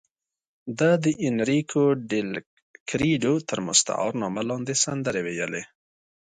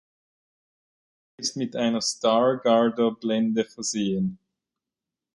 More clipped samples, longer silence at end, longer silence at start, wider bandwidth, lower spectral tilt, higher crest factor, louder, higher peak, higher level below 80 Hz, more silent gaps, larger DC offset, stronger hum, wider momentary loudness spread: neither; second, 0.55 s vs 1 s; second, 0.65 s vs 1.4 s; second, 9.6 kHz vs 11.5 kHz; about the same, -4 dB/octave vs -4.5 dB/octave; about the same, 20 dB vs 20 dB; about the same, -24 LUFS vs -24 LUFS; about the same, -6 dBFS vs -6 dBFS; first, -60 dBFS vs -66 dBFS; first, 2.46-2.74 s, 2.80-2.86 s vs none; neither; neither; first, 12 LU vs 8 LU